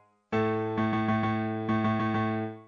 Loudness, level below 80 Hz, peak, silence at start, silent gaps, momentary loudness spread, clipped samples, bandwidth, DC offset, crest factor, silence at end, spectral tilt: -29 LUFS; -60 dBFS; -16 dBFS; 0.3 s; none; 3 LU; under 0.1%; 6.6 kHz; under 0.1%; 14 dB; 0.05 s; -8.5 dB/octave